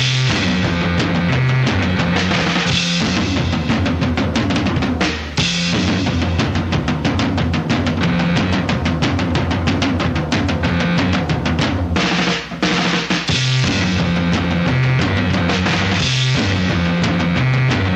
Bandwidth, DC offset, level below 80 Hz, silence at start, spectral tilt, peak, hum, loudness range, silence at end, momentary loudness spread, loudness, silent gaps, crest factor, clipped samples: 8.8 kHz; under 0.1%; -32 dBFS; 0 s; -5.5 dB/octave; -2 dBFS; none; 1 LU; 0 s; 3 LU; -17 LUFS; none; 16 dB; under 0.1%